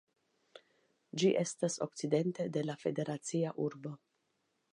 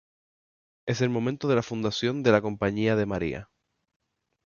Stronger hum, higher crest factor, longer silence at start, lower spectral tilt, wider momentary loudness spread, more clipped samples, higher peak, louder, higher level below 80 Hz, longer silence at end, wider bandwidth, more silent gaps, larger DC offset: neither; about the same, 20 dB vs 22 dB; second, 0.55 s vs 0.85 s; about the same, -5.5 dB/octave vs -6 dB/octave; first, 13 LU vs 9 LU; neither; second, -16 dBFS vs -6 dBFS; second, -35 LUFS vs -26 LUFS; second, -84 dBFS vs -54 dBFS; second, 0.75 s vs 1 s; first, 11.5 kHz vs 7.2 kHz; neither; neither